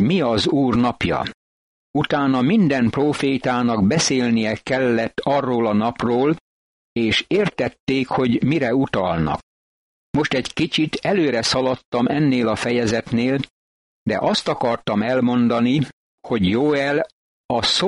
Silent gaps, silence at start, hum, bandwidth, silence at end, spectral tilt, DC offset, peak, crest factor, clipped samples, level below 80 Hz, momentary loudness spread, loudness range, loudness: 1.34-1.94 s, 6.40-6.96 s, 7.80-7.87 s, 9.43-10.14 s, 11.85-11.92 s, 13.50-14.06 s, 15.93-16.18 s, 17.13-17.49 s; 0 s; none; 11.5 kHz; 0 s; -5 dB/octave; under 0.1%; -6 dBFS; 14 dB; under 0.1%; -48 dBFS; 7 LU; 2 LU; -20 LUFS